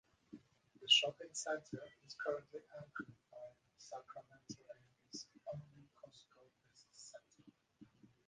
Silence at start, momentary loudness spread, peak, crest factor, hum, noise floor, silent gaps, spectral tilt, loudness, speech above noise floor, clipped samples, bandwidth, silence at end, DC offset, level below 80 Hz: 0.3 s; 28 LU; -18 dBFS; 28 dB; none; -72 dBFS; none; -1.5 dB/octave; -39 LUFS; 28 dB; under 0.1%; 9.6 kHz; 0.45 s; under 0.1%; -84 dBFS